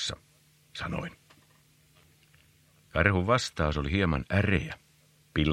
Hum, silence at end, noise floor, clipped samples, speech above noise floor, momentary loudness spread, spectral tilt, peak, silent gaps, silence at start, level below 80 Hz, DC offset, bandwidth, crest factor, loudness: none; 0 s; -63 dBFS; under 0.1%; 35 dB; 17 LU; -5.5 dB/octave; -6 dBFS; none; 0 s; -44 dBFS; under 0.1%; 12.5 kHz; 26 dB; -29 LUFS